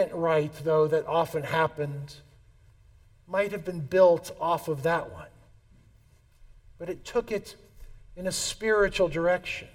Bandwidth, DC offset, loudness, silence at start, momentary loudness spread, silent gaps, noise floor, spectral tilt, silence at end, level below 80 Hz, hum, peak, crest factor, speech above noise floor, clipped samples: 17 kHz; under 0.1%; -27 LUFS; 0 s; 16 LU; none; -59 dBFS; -4.5 dB/octave; 0.05 s; -52 dBFS; none; -8 dBFS; 20 dB; 32 dB; under 0.1%